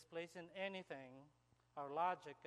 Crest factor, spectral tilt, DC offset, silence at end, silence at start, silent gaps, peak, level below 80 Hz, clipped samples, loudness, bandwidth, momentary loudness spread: 20 dB; -5 dB/octave; under 0.1%; 0 s; 0 s; none; -28 dBFS; -88 dBFS; under 0.1%; -47 LUFS; 12.5 kHz; 17 LU